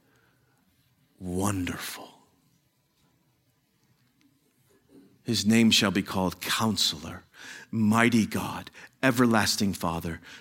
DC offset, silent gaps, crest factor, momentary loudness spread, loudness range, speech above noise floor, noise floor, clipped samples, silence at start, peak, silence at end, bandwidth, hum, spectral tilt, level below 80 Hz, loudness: under 0.1%; none; 24 dB; 20 LU; 12 LU; 44 dB; -70 dBFS; under 0.1%; 1.2 s; -4 dBFS; 0 s; 17 kHz; none; -4 dB/octave; -58 dBFS; -25 LUFS